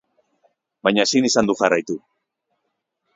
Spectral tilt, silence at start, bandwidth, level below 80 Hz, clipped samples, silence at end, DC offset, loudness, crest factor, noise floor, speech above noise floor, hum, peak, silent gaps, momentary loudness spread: -3.5 dB/octave; 0.85 s; 7.8 kHz; -58 dBFS; under 0.1%; 1.2 s; under 0.1%; -18 LUFS; 22 dB; -76 dBFS; 57 dB; none; 0 dBFS; none; 11 LU